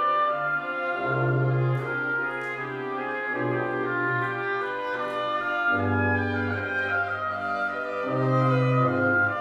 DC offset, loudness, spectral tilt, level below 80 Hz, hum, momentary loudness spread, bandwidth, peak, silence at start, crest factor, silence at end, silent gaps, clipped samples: under 0.1%; -26 LUFS; -8 dB/octave; -64 dBFS; none; 7 LU; 6.6 kHz; -12 dBFS; 0 s; 14 dB; 0 s; none; under 0.1%